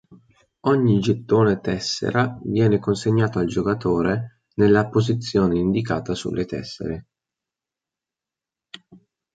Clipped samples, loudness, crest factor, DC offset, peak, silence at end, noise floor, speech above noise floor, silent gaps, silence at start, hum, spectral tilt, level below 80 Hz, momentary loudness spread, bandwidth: under 0.1%; -21 LUFS; 18 dB; under 0.1%; -4 dBFS; 0.4 s; -88 dBFS; 68 dB; none; 0.1 s; none; -6.5 dB/octave; -48 dBFS; 10 LU; 9.2 kHz